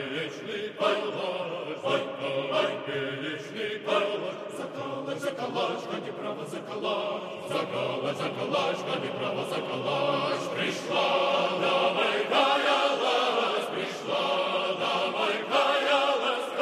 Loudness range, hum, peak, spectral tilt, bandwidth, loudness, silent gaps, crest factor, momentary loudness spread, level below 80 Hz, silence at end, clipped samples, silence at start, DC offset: 7 LU; none; -10 dBFS; -4 dB/octave; 14 kHz; -28 LUFS; none; 20 dB; 10 LU; -80 dBFS; 0 s; under 0.1%; 0 s; under 0.1%